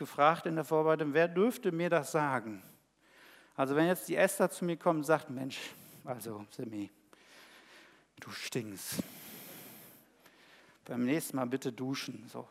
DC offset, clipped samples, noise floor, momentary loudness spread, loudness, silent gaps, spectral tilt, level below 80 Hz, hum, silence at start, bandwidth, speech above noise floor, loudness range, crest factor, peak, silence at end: under 0.1%; under 0.1%; -64 dBFS; 18 LU; -33 LUFS; none; -5 dB/octave; -82 dBFS; none; 0 s; 16 kHz; 32 dB; 11 LU; 22 dB; -12 dBFS; 0.05 s